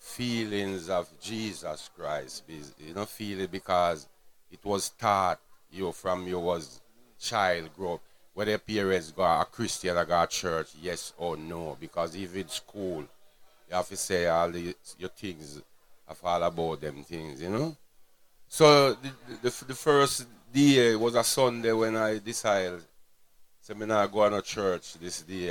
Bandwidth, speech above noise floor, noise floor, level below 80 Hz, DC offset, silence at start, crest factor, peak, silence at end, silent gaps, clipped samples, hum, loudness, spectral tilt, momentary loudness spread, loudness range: 18.5 kHz; 28 dB; -57 dBFS; -60 dBFS; under 0.1%; 0.05 s; 24 dB; -6 dBFS; 0 s; none; under 0.1%; none; -29 LUFS; -4 dB/octave; 15 LU; 9 LU